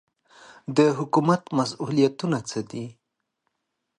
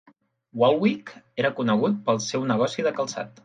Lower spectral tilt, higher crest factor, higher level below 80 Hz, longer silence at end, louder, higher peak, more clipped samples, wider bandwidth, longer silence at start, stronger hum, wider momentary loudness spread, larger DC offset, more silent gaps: about the same, -6 dB/octave vs -5 dB/octave; about the same, 20 dB vs 18 dB; about the same, -68 dBFS vs -70 dBFS; first, 1.1 s vs 0.15 s; about the same, -24 LUFS vs -24 LUFS; about the same, -6 dBFS vs -6 dBFS; neither; first, 11 kHz vs 9.4 kHz; first, 0.7 s vs 0.55 s; neither; first, 15 LU vs 11 LU; neither; neither